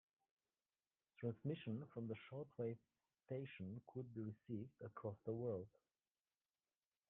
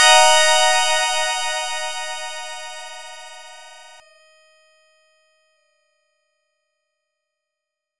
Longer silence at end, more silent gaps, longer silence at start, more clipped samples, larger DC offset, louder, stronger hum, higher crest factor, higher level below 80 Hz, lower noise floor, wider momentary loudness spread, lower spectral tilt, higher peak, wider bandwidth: first, 1.4 s vs 0 s; neither; first, 1.2 s vs 0 s; neither; neither; second, -51 LUFS vs -16 LUFS; neither; about the same, 20 dB vs 20 dB; second, -86 dBFS vs -66 dBFS; first, under -90 dBFS vs -83 dBFS; second, 7 LU vs 26 LU; first, -8 dB/octave vs 4 dB/octave; second, -32 dBFS vs -2 dBFS; second, 3.9 kHz vs 11.5 kHz